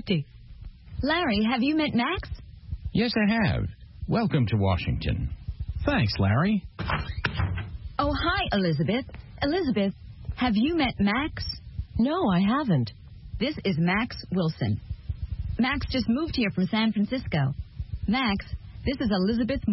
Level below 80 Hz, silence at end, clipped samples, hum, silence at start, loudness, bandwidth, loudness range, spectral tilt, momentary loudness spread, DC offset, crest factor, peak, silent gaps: -40 dBFS; 0 s; under 0.1%; none; 0 s; -27 LUFS; 5.8 kHz; 2 LU; -9.5 dB/octave; 13 LU; under 0.1%; 16 dB; -10 dBFS; none